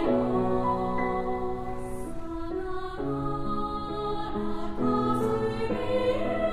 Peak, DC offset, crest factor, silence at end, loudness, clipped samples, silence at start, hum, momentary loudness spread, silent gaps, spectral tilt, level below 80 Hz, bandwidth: -14 dBFS; under 0.1%; 14 dB; 0 s; -30 LUFS; under 0.1%; 0 s; none; 9 LU; none; -7.5 dB/octave; -42 dBFS; 14 kHz